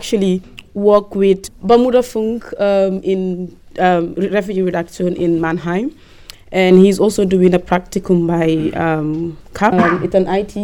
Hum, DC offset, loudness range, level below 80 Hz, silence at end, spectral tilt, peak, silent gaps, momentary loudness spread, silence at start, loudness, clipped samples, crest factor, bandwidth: none; under 0.1%; 4 LU; -42 dBFS; 0 s; -6.5 dB/octave; 0 dBFS; none; 10 LU; 0 s; -15 LUFS; under 0.1%; 14 dB; 17.5 kHz